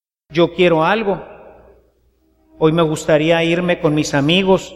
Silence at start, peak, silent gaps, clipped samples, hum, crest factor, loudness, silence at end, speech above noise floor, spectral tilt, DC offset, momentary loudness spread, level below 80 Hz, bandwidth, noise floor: 0.3 s; 0 dBFS; none; under 0.1%; none; 16 dB; -15 LUFS; 0 s; 44 dB; -5.5 dB/octave; under 0.1%; 5 LU; -46 dBFS; 13 kHz; -58 dBFS